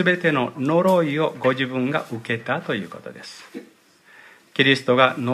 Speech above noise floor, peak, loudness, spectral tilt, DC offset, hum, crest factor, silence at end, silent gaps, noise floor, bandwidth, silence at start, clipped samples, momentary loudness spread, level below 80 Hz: 32 dB; 0 dBFS; -21 LUFS; -6 dB/octave; under 0.1%; none; 22 dB; 0 s; none; -53 dBFS; 15 kHz; 0 s; under 0.1%; 20 LU; -70 dBFS